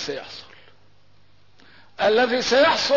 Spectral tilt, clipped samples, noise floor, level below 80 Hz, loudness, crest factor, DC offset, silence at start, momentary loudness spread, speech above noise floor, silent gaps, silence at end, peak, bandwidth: -2.5 dB/octave; under 0.1%; -59 dBFS; -60 dBFS; -19 LUFS; 14 dB; 0.3%; 0 s; 20 LU; 39 dB; none; 0 s; -8 dBFS; 6 kHz